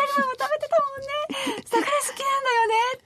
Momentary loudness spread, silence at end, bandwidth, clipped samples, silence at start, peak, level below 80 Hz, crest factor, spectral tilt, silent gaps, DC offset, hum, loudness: 7 LU; 0.05 s; 13.5 kHz; under 0.1%; 0 s; -10 dBFS; -68 dBFS; 14 dB; -1.5 dB/octave; none; under 0.1%; none; -24 LUFS